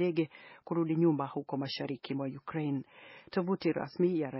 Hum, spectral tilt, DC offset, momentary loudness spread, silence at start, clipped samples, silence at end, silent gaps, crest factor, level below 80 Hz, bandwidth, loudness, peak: none; -6.5 dB/octave; under 0.1%; 10 LU; 0 s; under 0.1%; 0 s; none; 16 dB; -76 dBFS; 5.8 kHz; -34 LUFS; -16 dBFS